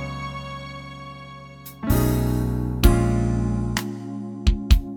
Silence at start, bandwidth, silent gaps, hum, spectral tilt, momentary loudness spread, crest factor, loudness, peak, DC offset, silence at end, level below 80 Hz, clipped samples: 0 s; 19.5 kHz; none; none; -6.5 dB/octave; 18 LU; 22 dB; -23 LUFS; -2 dBFS; under 0.1%; 0 s; -26 dBFS; under 0.1%